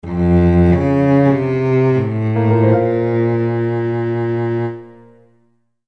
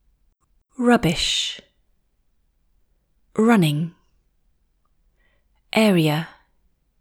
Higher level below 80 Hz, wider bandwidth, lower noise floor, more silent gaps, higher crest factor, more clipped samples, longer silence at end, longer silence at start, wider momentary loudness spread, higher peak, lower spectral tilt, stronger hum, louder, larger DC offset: first, -36 dBFS vs -50 dBFS; second, 6.2 kHz vs 17.5 kHz; second, -60 dBFS vs -65 dBFS; neither; second, 14 dB vs 20 dB; neither; first, 0.95 s vs 0.7 s; second, 0 s vs 0.8 s; second, 6 LU vs 14 LU; about the same, -2 dBFS vs -4 dBFS; first, -10.5 dB/octave vs -5 dB/octave; neither; first, -15 LUFS vs -20 LUFS; first, 0.3% vs under 0.1%